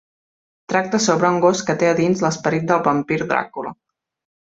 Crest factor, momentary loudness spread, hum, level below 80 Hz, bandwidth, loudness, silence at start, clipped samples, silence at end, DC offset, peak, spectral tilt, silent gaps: 18 dB; 6 LU; none; -60 dBFS; 8 kHz; -18 LUFS; 0.7 s; under 0.1%; 0.75 s; under 0.1%; -2 dBFS; -5 dB/octave; none